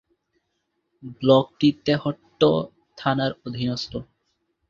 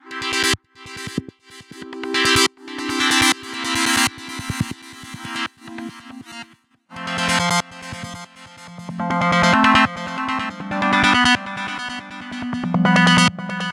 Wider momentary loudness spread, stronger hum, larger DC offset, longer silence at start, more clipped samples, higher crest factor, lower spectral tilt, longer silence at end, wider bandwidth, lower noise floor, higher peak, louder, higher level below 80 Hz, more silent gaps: second, 14 LU vs 22 LU; neither; neither; first, 1.05 s vs 0.05 s; neither; about the same, 22 dB vs 20 dB; first, -7 dB/octave vs -3 dB/octave; first, 0.65 s vs 0 s; second, 7.4 kHz vs 16.5 kHz; first, -75 dBFS vs -51 dBFS; about the same, -2 dBFS vs -2 dBFS; second, -23 LUFS vs -18 LUFS; second, -58 dBFS vs -50 dBFS; neither